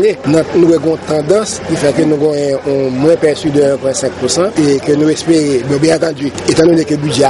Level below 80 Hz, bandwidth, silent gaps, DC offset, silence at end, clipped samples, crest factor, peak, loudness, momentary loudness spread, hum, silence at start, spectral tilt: -46 dBFS; 11.5 kHz; none; under 0.1%; 0 s; under 0.1%; 12 dB; 0 dBFS; -12 LUFS; 5 LU; none; 0 s; -5.5 dB/octave